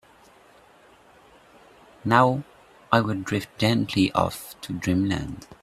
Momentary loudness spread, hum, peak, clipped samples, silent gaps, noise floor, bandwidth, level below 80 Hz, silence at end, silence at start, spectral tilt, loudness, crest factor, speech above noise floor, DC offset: 14 LU; none; -2 dBFS; under 0.1%; none; -54 dBFS; 15.5 kHz; -54 dBFS; 0.1 s; 2.05 s; -6 dB/octave; -24 LUFS; 24 dB; 31 dB; under 0.1%